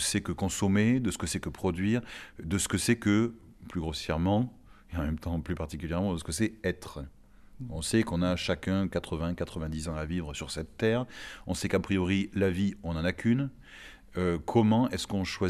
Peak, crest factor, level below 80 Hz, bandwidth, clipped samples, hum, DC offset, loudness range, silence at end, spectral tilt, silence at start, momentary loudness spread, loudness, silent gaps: -10 dBFS; 20 dB; -46 dBFS; 15 kHz; under 0.1%; none; under 0.1%; 4 LU; 0 s; -5.5 dB/octave; 0 s; 14 LU; -30 LUFS; none